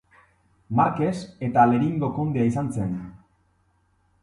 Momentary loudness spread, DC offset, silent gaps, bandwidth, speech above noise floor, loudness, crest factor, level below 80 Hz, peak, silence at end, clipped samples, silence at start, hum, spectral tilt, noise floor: 11 LU; under 0.1%; none; 11.5 kHz; 43 dB; -23 LUFS; 20 dB; -54 dBFS; -6 dBFS; 1.05 s; under 0.1%; 0.7 s; none; -8.5 dB/octave; -66 dBFS